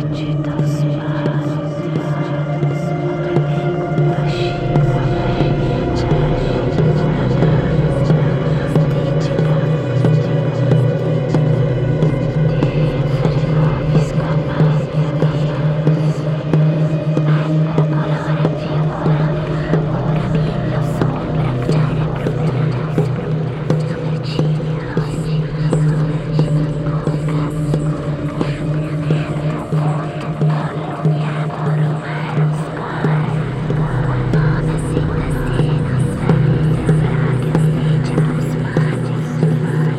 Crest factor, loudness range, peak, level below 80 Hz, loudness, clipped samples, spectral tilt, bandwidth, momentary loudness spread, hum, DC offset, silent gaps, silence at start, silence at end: 14 dB; 3 LU; 0 dBFS; -34 dBFS; -17 LUFS; under 0.1%; -8.5 dB/octave; 9.4 kHz; 5 LU; none; under 0.1%; none; 0 s; 0 s